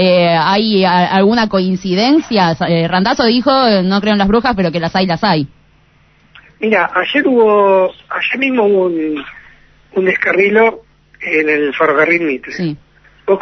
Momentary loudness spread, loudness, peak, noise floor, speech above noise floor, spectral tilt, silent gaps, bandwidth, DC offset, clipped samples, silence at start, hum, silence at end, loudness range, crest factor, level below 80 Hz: 10 LU; -13 LUFS; 0 dBFS; -50 dBFS; 38 dB; -6.5 dB/octave; none; 6.4 kHz; under 0.1%; under 0.1%; 0 s; none; 0 s; 3 LU; 12 dB; -44 dBFS